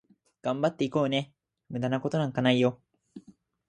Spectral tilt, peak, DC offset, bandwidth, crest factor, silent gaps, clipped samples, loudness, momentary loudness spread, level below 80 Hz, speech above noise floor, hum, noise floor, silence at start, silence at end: -6.5 dB/octave; -8 dBFS; under 0.1%; 9.6 kHz; 20 dB; none; under 0.1%; -28 LUFS; 11 LU; -70 dBFS; 29 dB; none; -56 dBFS; 0.45 s; 0.5 s